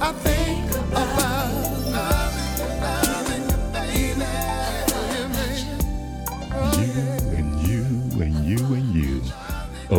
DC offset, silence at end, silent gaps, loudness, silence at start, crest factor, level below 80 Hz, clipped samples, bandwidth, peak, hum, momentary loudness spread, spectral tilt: under 0.1%; 0 s; none; -24 LUFS; 0 s; 20 dB; -28 dBFS; under 0.1%; 19 kHz; -4 dBFS; none; 6 LU; -5 dB/octave